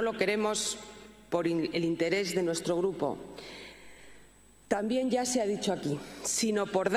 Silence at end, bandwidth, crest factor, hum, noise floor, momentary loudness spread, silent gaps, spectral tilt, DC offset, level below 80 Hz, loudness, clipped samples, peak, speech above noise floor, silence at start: 0 s; 14.5 kHz; 20 dB; none; -57 dBFS; 16 LU; none; -4 dB/octave; under 0.1%; -62 dBFS; -30 LUFS; under 0.1%; -12 dBFS; 27 dB; 0 s